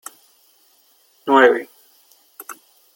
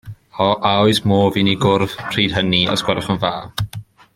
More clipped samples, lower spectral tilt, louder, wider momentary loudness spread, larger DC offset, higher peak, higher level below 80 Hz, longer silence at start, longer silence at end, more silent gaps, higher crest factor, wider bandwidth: neither; second, -3 dB/octave vs -5.5 dB/octave; about the same, -15 LUFS vs -17 LUFS; first, 26 LU vs 11 LU; neither; about the same, 0 dBFS vs -2 dBFS; second, -70 dBFS vs -46 dBFS; first, 1.25 s vs 0.05 s; about the same, 0.45 s vs 0.35 s; neither; first, 22 dB vs 16 dB; about the same, 17 kHz vs 16.5 kHz